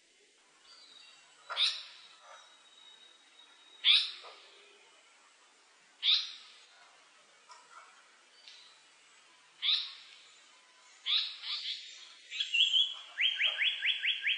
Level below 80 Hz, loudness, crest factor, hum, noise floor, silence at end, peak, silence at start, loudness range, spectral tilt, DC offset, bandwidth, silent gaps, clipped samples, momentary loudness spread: under -90 dBFS; -30 LUFS; 24 dB; none; -66 dBFS; 0 s; -14 dBFS; 0.7 s; 8 LU; 4.5 dB/octave; under 0.1%; 10.5 kHz; none; under 0.1%; 27 LU